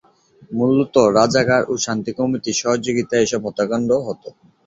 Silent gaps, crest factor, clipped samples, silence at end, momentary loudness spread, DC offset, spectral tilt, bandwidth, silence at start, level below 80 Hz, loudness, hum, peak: none; 18 dB; under 0.1%; 0.35 s; 7 LU; under 0.1%; -4.5 dB/octave; 7.8 kHz; 0.4 s; -54 dBFS; -18 LUFS; none; -2 dBFS